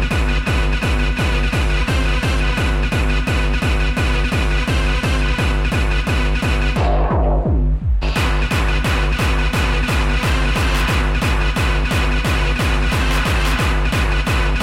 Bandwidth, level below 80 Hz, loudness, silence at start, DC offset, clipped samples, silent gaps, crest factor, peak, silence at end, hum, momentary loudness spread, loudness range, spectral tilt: 15 kHz; -18 dBFS; -18 LUFS; 0 s; under 0.1%; under 0.1%; none; 10 dB; -6 dBFS; 0 s; none; 1 LU; 1 LU; -5 dB/octave